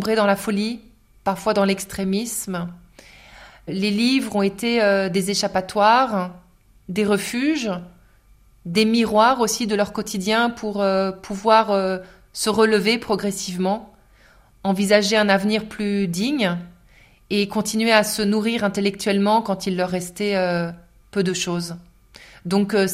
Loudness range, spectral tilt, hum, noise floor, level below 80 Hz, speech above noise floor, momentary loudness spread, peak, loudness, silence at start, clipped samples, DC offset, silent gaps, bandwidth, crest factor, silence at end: 3 LU; -4.5 dB/octave; none; -53 dBFS; -54 dBFS; 33 dB; 12 LU; -2 dBFS; -21 LUFS; 0 s; under 0.1%; under 0.1%; none; 16 kHz; 20 dB; 0 s